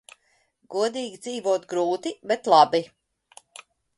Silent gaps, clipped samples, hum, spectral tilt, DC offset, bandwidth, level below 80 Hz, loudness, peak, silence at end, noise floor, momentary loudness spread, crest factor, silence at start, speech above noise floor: none; under 0.1%; none; -4 dB/octave; under 0.1%; 11.5 kHz; -74 dBFS; -23 LUFS; -2 dBFS; 1.15 s; -67 dBFS; 15 LU; 22 dB; 0.7 s; 44 dB